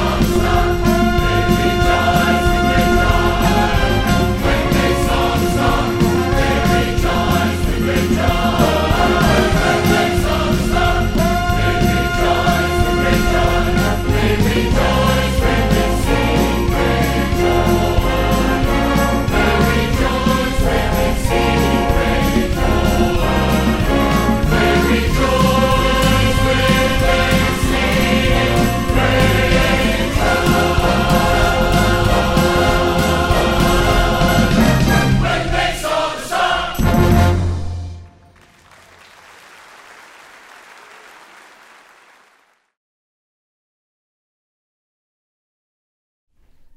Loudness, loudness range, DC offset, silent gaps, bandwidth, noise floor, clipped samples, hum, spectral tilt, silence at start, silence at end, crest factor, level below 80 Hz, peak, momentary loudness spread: -15 LUFS; 2 LU; under 0.1%; none; 16 kHz; -57 dBFS; under 0.1%; none; -5.5 dB/octave; 0 s; 8.7 s; 14 dB; -22 dBFS; -2 dBFS; 3 LU